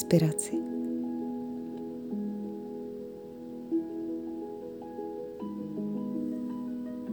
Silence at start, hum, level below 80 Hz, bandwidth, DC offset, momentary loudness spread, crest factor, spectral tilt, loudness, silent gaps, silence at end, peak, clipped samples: 0 s; none; -70 dBFS; over 20 kHz; under 0.1%; 9 LU; 24 dB; -6.5 dB/octave; -35 LUFS; none; 0 s; -10 dBFS; under 0.1%